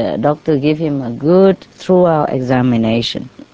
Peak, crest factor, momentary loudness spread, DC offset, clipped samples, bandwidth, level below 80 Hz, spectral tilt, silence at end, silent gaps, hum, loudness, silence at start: 0 dBFS; 14 dB; 8 LU; under 0.1%; under 0.1%; 8 kHz; -46 dBFS; -7.5 dB/octave; 0.1 s; none; none; -14 LUFS; 0 s